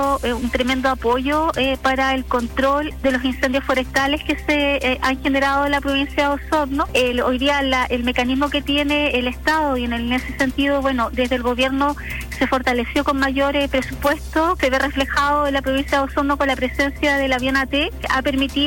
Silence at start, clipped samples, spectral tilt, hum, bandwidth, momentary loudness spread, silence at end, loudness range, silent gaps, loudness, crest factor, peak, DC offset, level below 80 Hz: 0 s; under 0.1%; -4.5 dB/octave; none; 16.5 kHz; 3 LU; 0 s; 1 LU; none; -19 LUFS; 14 dB; -6 dBFS; under 0.1%; -34 dBFS